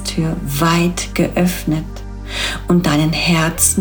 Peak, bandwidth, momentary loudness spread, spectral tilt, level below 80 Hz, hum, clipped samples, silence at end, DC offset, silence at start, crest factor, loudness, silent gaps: -2 dBFS; over 20 kHz; 8 LU; -4 dB/octave; -30 dBFS; none; under 0.1%; 0 s; under 0.1%; 0 s; 16 dB; -16 LUFS; none